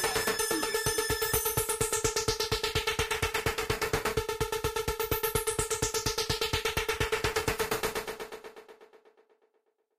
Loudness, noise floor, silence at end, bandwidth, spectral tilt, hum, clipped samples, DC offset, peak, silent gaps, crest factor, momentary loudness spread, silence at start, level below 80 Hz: -30 LUFS; -75 dBFS; 1 s; 15.5 kHz; -2.5 dB/octave; none; under 0.1%; under 0.1%; -12 dBFS; none; 20 dB; 4 LU; 0 s; -46 dBFS